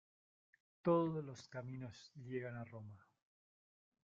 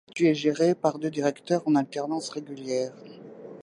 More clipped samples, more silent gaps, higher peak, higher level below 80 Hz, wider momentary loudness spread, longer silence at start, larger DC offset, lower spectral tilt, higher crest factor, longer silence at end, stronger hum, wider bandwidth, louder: neither; neither; second, -24 dBFS vs -8 dBFS; about the same, -80 dBFS vs -78 dBFS; about the same, 19 LU vs 19 LU; first, 0.85 s vs 0.15 s; neither; first, -7.5 dB/octave vs -5.5 dB/octave; about the same, 22 dB vs 18 dB; first, 1.15 s vs 0 s; neither; second, 7.4 kHz vs 11 kHz; second, -42 LUFS vs -27 LUFS